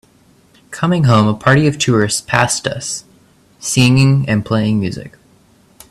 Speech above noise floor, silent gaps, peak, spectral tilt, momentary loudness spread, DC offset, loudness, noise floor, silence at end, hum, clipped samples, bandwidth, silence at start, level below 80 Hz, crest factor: 37 dB; none; 0 dBFS; -5 dB/octave; 12 LU; under 0.1%; -14 LUFS; -50 dBFS; 0.8 s; none; under 0.1%; 13 kHz; 0.7 s; -46 dBFS; 16 dB